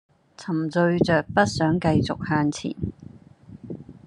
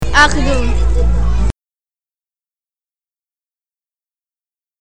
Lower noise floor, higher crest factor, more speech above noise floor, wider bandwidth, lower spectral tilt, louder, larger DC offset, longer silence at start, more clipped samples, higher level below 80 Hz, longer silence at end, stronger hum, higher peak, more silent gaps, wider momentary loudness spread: second, -46 dBFS vs under -90 dBFS; about the same, 20 dB vs 16 dB; second, 24 dB vs over 79 dB; about the same, 10.5 kHz vs 10 kHz; first, -6.5 dB/octave vs -4.5 dB/octave; second, -23 LUFS vs -15 LUFS; neither; first, 0.4 s vs 0 s; neither; second, -50 dBFS vs -20 dBFS; about the same, 0.1 s vs 0 s; neither; second, -4 dBFS vs 0 dBFS; neither; first, 18 LU vs 10 LU